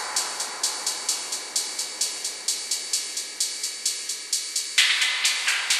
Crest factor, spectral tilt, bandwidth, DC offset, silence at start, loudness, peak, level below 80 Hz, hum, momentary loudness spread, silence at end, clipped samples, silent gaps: 22 dB; 4 dB/octave; 13 kHz; under 0.1%; 0 s; -24 LUFS; -4 dBFS; -76 dBFS; none; 7 LU; 0 s; under 0.1%; none